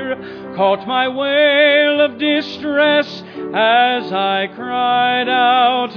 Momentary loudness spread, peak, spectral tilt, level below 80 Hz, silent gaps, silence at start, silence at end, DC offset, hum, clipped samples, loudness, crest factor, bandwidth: 11 LU; -2 dBFS; -5.5 dB/octave; -64 dBFS; none; 0 s; 0 s; under 0.1%; none; under 0.1%; -15 LUFS; 14 dB; 5.4 kHz